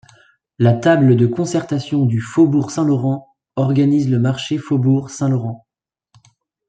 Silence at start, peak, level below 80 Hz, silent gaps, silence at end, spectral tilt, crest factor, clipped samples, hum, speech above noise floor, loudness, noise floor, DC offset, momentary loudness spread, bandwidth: 0.6 s; -2 dBFS; -58 dBFS; none; 1.1 s; -7.5 dB/octave; 16 dB; under 0.1%; none; 70 dB; -17 LUFS; -85 dBFS; under 0.1%; 9 LU; 9.2 kHz